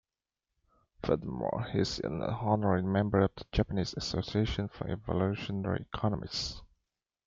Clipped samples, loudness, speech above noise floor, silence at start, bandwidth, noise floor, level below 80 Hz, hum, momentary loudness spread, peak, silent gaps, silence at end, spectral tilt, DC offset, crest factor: under 0.1%; -33 LUFS; 58 dB; 1 s; 7.6 kHz; -90 dBFS; -48 dBFS; none; 7 LU; -12 dBFS; none; 0.6 s; -6.5 dB/octave; under 0.1%; 20 dB